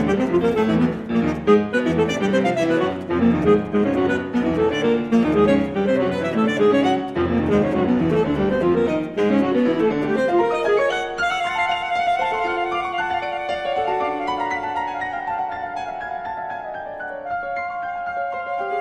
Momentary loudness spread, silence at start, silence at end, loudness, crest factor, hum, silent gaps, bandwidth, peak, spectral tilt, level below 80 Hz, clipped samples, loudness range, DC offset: 9 LU; 0 s; 0 s; -21 LUFS; 18 dB; none; none; 10.5 kHz; -2 dBFS; -6.5 dB/octave; -46 dBFS; under 0.1%; 7 LU; under 0.1%